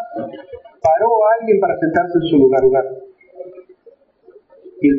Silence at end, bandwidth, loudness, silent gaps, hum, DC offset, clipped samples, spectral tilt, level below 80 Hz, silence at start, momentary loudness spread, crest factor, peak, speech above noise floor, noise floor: 0 s; 6.8 kHz; -15 LUFS; none; none; under 0.1%; under 0.1%; -5.5 dB/octave; -52 dBFS; 0 s; 23 LU; 14 dB; -2 dBFS; 35 dB; -49 dBFS